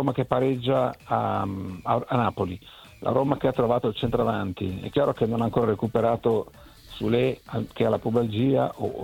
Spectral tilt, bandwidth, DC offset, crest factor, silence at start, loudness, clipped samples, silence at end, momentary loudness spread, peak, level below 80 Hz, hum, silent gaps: -8 dB/octave; 17 kHz; under 0.1%; 20 dB; 0 s; -25 LUFS; under 0.1%; 0 s; 8 LU; -6 dBFS; -52 dBFS; none; none